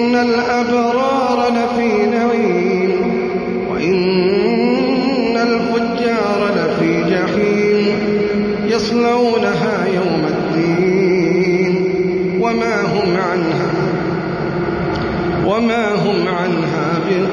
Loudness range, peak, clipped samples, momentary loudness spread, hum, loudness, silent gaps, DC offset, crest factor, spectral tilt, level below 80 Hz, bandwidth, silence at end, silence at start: 2 LU; -4 dBFS; under 0.1%; 4 LU; none; -16 LUFS; none; under 0.1%; 12 dB; -6.5 dB/octave; -44 dBFS; 10 kHz; 0 s; 0 s